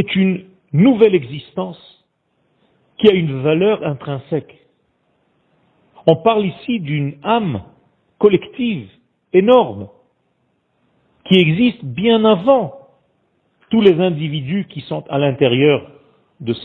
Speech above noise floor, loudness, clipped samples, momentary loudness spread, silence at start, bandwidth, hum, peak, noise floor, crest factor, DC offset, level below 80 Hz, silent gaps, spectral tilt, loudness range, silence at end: 50 dB; -16 LUFS; under 0.1%; 14 LU; 0 s; 4.5 kHz; none; 0 dBFS; -65 dBFS; 18 dB; under 0.1%; -56 dBFS; none; -9.5 dB/octave; 4 LU; 0 s